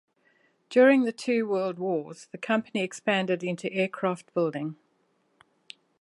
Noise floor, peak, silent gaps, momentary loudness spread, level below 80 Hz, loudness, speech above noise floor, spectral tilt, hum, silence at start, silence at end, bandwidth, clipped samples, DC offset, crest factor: -70 dBFS; -10 dBFS; none; 12 LU; -80 dBFS; -27 LUFS; 44 dB; -5.5 dB/octave; none; 0.7 s; 1.25 s; 11.5 kHz; under 0.1%; under 0.1%; 18 dB